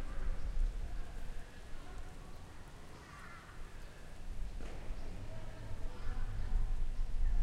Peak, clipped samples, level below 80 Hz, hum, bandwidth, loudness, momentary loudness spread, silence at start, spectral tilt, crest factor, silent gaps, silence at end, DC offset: -22 dBFS; under 0.1%; -38 dBFS; none; 9.6 kHz; -47 LUFS; 12 LU; 0 s; -5.5 dB/octave; 16 dB; none; 0 s; under 0.1%